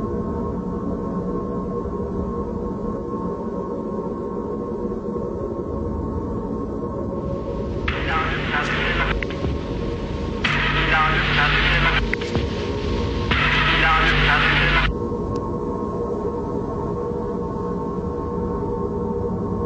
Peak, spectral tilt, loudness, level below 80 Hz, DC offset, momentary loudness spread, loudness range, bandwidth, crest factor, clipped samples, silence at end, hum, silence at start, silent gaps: -4 dBFS; -6 dB/octave; -22 LUFS; -30 dBFS; under 0.1%; 11 LU; 8 LU; 8.4 kHz; 18 dB; under 0.1%; 0 s; none; 0 s; none